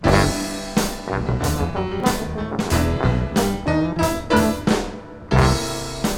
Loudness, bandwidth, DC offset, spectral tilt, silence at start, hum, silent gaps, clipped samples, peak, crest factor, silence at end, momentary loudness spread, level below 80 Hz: -21 LUFS; 18 kHz; under 0.1%; -5.5 dB/octave; 0 s; none; none; under 0.1%; -2 dBFS; 20 dB; 0 s; 7 LU; -30 dBFS